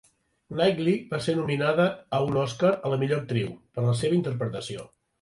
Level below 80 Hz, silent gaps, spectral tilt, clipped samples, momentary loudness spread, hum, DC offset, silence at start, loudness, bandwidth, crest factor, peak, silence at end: -60 dBFS; none; -6.5 dB/octave; under 0.1%; 9 LU; none; under 0.1%; 0.5 s; -26 LUFS; 11.5 kHz; 16 dB; -10 dBFS; 0.35 s